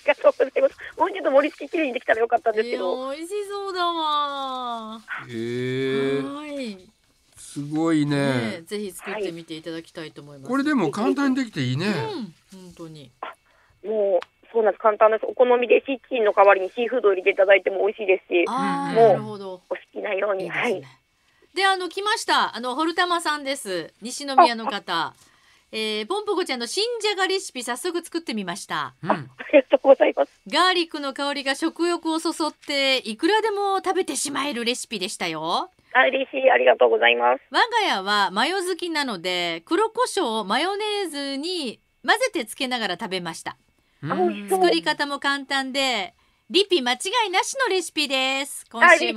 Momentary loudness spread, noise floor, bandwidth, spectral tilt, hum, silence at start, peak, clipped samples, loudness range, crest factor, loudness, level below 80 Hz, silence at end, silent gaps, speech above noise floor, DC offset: 14 LU; -62 dBFS; 15.5 kHz; -3.5 dB/octave; none; 0.05 s; -2 dBFS; under 0.1%; 7 LU; 22 dB; -22 LUFS; -70 dBFS; 0 s; none; 39 dB; under 0.1%